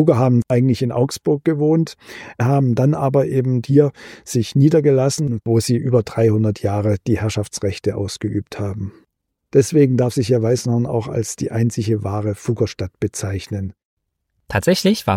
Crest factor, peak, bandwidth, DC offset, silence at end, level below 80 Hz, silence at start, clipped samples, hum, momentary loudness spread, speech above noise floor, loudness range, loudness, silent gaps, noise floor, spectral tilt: 16 dB; -2 dBFS; 16 kHz; under 0.1%; 0 s; -50 dBFS; 0 s; under 0.1%; none; 10 LU; 54 dB; 5 LU; -18 LUFS; 13.85-13.97 s; -71 dBFS; -6.5 dB/octave